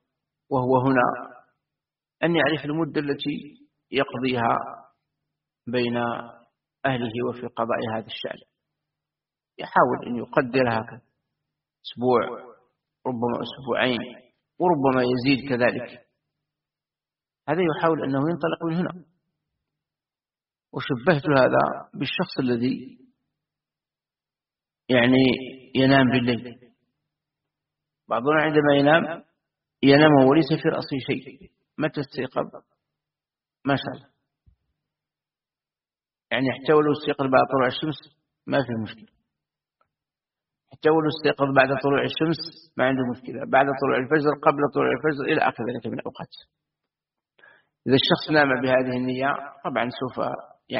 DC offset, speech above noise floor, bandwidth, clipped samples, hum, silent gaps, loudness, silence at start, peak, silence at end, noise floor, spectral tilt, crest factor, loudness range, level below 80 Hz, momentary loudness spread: under 0.1%; over 67 dB; 5.6 kHz; under 0.1%; none; none; -23 LUFS; 0.5 s; -2 dBFS; 0 s; under -90 dBFS; -4 dB/octave; 22 dB; 8 LU; -62 dBFS; 15 LU